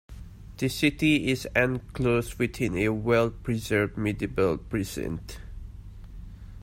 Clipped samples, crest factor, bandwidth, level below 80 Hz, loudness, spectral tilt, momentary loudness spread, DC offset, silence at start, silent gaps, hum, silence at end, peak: under 0.1%; 20 dB; 16 kHz; -44 dBFS; -27 LUFS; -6 dB/octave; 22 LU; under 0.1%; 0.1 s; none; none; 0 s; -8 dBFS